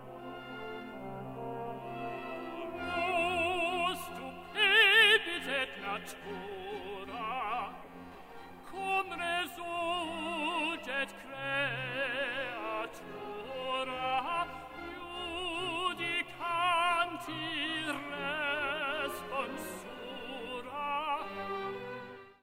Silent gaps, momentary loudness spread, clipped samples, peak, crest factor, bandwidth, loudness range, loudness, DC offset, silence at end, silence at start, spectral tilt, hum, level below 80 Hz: none; 14 LU; under 0.1%; -12 dBFS; 22 dB; 16 kHz; 10 LU; -33 LUFS; under 0.1%; 0.1 s; 0 s; -3 dB/octave; none; -64 dBFS